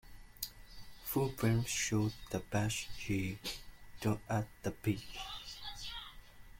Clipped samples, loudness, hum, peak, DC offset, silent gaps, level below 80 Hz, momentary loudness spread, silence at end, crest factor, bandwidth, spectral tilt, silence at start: under 0.1%; -38 LUFS; none; -18 dBFS; under 0.1%; none; -56 dBFS; 12 LU; 0 s; 20 dB; 16.5 kHz; -4.5 dB/octave; 0.05 s